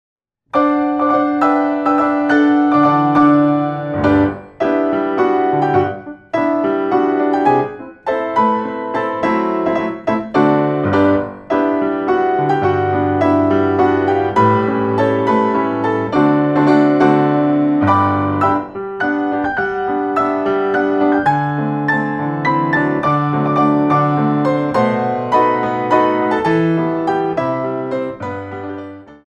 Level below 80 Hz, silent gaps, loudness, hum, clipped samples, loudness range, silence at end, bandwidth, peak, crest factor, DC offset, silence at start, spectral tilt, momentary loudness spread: -50 dBFS; none; -15 LUFS; none; under 0.1%; 3 LU; 0.15 s; 7 kHz; 0 dBFS; 14 dB; under 0.1%; 0.55 s; -8.5 dB/octave; 7 LU